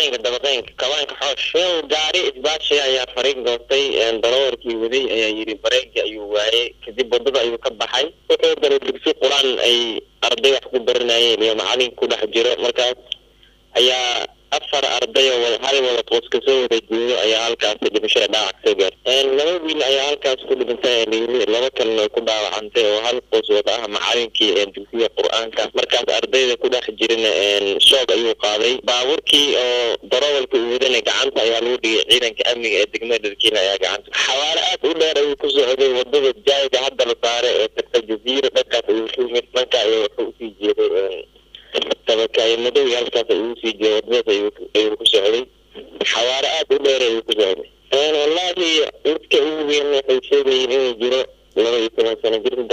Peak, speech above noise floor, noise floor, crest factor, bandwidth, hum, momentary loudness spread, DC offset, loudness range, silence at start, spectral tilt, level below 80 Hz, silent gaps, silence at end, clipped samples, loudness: -2 dBFS; 34 dB; -52 dBFS; 16 dB; 15.5 kHz; none; 6 LU; under 0.1%; 3 LU; 0 s; -1 dB/octave; -56 dBFS; none; 0 s; under 0.1%; -17 LUFS